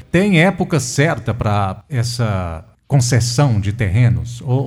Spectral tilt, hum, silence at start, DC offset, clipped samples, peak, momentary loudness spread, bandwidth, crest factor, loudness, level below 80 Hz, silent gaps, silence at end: -5.5 dB/octave; none; 0.15 s; under 0.1%; under 0.1%; 0 dBFS; 8 LU; 13.5 kHz; 16 dB; -17 LUFS; -38 dBFS; none; 0 s